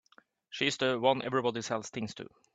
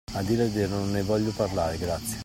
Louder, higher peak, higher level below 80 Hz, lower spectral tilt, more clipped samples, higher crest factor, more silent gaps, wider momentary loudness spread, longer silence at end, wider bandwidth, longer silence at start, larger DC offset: second, -31 LUFS vs -27 LUFS; about the same, -12 dBFS vs -12 dBFS; second, -72 dBFS vs -46 dBFS; second, -4 dB/octave vs -5.5 dB/octave; neither; first, 22 dB vs 14 dB; neither; first, 13 LU vs 3 LU; first, 0.3 s vs 0 s; second, 9.2 kHz vs 16.5 kHz; first, 0.5 s vs 0.1 s; neither